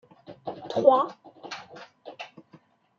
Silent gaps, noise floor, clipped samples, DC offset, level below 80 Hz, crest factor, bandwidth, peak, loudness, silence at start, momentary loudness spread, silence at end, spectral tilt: none; -58 dBFS; under 0.1%; under 0.1%; -78 dBFS; 24 dB; 7.2 kHz; -6 dBFS; -23 LUFS; 0.3 s; 25 LU; 0.7 s; -5.5 dB/octave